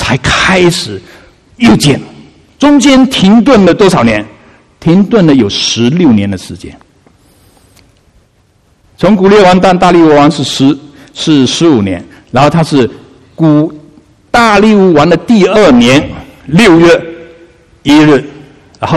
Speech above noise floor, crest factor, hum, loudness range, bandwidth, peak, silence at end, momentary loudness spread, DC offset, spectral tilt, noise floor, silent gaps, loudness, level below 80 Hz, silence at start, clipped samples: 43 dB; 8 dB; none; 4 LU; 13 kHz; 0 dBFS; 0 s; 13 LU; under 0.1%; -5.5 dB/octave; -49 dBFS; none; -7 LUFS; -34 dBFS; 0 s; 2%